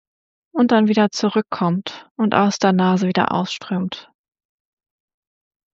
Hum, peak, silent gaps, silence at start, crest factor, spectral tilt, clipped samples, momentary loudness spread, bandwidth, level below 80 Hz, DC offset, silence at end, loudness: none; -2 dBFS; 2.11-2.15 s; 0.55 s; 18 dB; -5 dB/octave; under 0.1%; 11 LU; 7.8 kHz; -66 dBFS; under 0.1%; 1.75 s; -19 LUFS